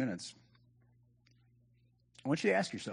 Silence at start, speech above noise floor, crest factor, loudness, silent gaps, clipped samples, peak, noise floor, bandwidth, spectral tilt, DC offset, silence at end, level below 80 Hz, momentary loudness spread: 0 s; 36 dB; 20 dB; -35 LUFS; none; under 0.1%; -18 dBFS; -70 dBFS; 10 kHz; -5 dB/octave; under 0.1%; 0 s; -80 dBFS; 14 LU